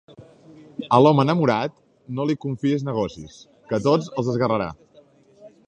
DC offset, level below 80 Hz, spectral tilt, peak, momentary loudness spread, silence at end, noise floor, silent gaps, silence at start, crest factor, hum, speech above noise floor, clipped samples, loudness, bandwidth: under 0.1%; -56 dBFS; -7.5 dB/octave; -2 dBFS; 17 LU; 0.2 s; -54 dBFS; none; 0.2 s; 22 dB; none; 33 dB; under 0.1%; -21 LUFS; 9.4 kHz